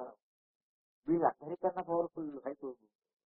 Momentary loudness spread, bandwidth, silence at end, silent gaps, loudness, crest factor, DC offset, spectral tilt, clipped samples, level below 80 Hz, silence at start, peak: 15 LU; 3 kHz; 0.5 s; 0.22-1.03 s; -36 LUFS; 22 dB; under 0.1%; -3.5 dB/octave; under 0.1%; -76 dBFS; 0 s; -16 dBFS